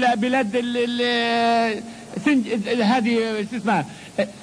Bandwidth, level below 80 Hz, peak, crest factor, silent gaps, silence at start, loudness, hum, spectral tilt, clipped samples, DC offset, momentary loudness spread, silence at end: 10.5 kHz; -62 dBFS; -6 dBFS; 14 dB; none; 0 s; -21 LUFS; none; -5 dB/octave; under 0.1%; under 0.1%; 8 LU; 0 s